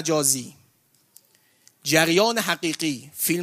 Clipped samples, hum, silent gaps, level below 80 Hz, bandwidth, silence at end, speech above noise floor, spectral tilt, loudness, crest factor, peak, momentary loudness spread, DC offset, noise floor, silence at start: under 0.1%; none; none; -68 dBFS; 15.5 kHz; 0 s; 41 dB; -2.5 dB/octave; -22 LUFS; 22 dB; -2 dBFS; 10 LU; under 0.1%; -63 dBFS; 0 s